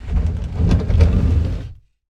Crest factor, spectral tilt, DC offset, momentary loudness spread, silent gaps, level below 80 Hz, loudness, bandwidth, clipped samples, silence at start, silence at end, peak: 16 dB; -8.5 dB/octave; under 0.1%; 11 LU; none; -20 dBFS; -18 LUFS; 7 kHz; under 0.1%; 0 s; 0.35 s; 0 dBFS